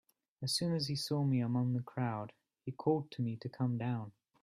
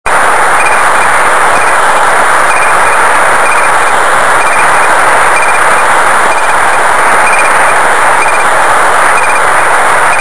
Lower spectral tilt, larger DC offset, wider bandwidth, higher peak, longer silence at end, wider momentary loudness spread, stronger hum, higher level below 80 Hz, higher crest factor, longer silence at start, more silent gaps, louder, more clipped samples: first, -6 dB/octave vs -1.5 dB/octave; second, under 0.1% vs 20%; first, 14 kHz vs 11 kHz; second, -20 dBFS vs 0 dBFS; first, 0.3 s vs 0 s; first, 11 LU vs 1 LU; neither; second, -74 dBFS vs -38 dBFS; first, 18 dB vs 8 dB; first, 0.4 s vs 0 s; neither; second, -36 LUFS vs -6 LUFS; second, under 0.1% vs 7%